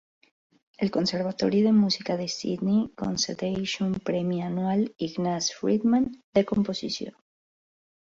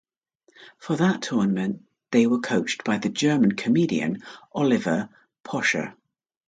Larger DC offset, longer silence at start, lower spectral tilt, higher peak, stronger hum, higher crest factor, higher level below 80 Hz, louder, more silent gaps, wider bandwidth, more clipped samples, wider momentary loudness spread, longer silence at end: neither; first, 0.8 s vs 0.6 s; about the same, -5 dB/octave vs -5.5 dB/octave; about the same, -8 dBFS vs -6 dBFS; neither; about the same, 18 dB vs 18 dB; first, -60 dBFS vs -66 dBFS; about the same, -26 LUFS vs -24 LUFS; first, 6.24-6.33 s vs none; second, 7.8 kHz vs 9.4 kHz; neither; second, 7 LU vs 14 LU; first, 0.9 s vs 0.55 s